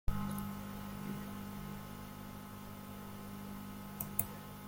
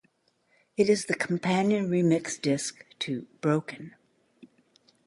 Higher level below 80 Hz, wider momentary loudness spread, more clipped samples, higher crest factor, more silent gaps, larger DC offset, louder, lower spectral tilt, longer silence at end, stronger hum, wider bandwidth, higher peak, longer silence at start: first, -50 dBFS vs -72 dBFS; about the same, 11 LU vs 13 LU; neither; first, 30 dB vs 18 dB; neither; neither; second, -44 LUFS vs -27 LUFS; about the same, -5 dB/octave vs -5 dB/octave; second, 0 s vs 1.2 s; first, 50 Hz at -50 dBFS vs none; first, 16.5 kHz vs 11.5 kHz; second, -14 dBFS vs -10 dBFS; second, 0.05 s vs 0.8 s